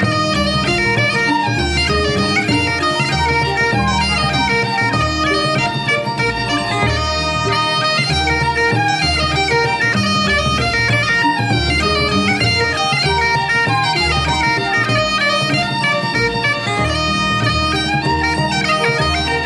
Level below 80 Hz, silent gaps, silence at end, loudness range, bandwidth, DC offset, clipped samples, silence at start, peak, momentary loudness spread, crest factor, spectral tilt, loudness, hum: -30 dBFS; none; 0 s; 1 LU; 11.5 kHz; under 0.1%; under 0.1%; 0 s; -2 dBFS; 2 LU; 14 dB; -4.5 dB/octave; -15 LUFS; none